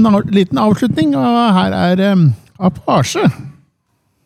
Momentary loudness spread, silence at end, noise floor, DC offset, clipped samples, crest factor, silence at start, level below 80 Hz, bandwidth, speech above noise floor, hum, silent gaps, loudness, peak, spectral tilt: 6 LU; 0.75 s; -63 dBFS; under 0.1%; under 0.1%; 10 dB; 0 s; -46 dBFS; 13.5 kHz; 51 dB; none; none; -13 LUFS; -2 dBFS; -6.5 dB/octave